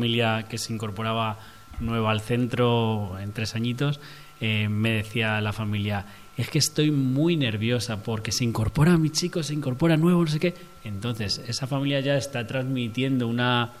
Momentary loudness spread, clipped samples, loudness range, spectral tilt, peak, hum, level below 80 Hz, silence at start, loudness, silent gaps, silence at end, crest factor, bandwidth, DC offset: 9 LU; under 0.1%; 3 LU; -5.5 dB/octave; -8 dBFS; none; -48 dBFS; 0 s; -25 LUFS; none; 0 s; 16 dB; 15 kHz; 0.3%